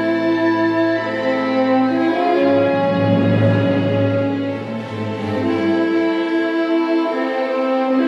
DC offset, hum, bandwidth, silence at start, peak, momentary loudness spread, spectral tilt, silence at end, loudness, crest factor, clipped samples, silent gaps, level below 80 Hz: under 0.1%; none; 7.4 kHz; 0 s; -4 dBFS; 6 LU; -8 dB/octave; 0 s; -17 LUFS; 14 dB; under 0.1%; none; -60 dBFS